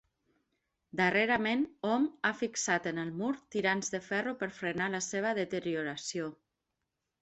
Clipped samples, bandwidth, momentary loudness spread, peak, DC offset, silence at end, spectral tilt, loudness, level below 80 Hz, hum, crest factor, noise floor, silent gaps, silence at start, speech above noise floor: under 0.1%; 8.2 kHz; 8 LU; -14 dBFS; under 0.1%; 0.9 s; -3.5 dB/octave; -33 LUFS; -72 dBFS; none; 20 dB; -86 dBFS; none; 0.95 s; 53 dB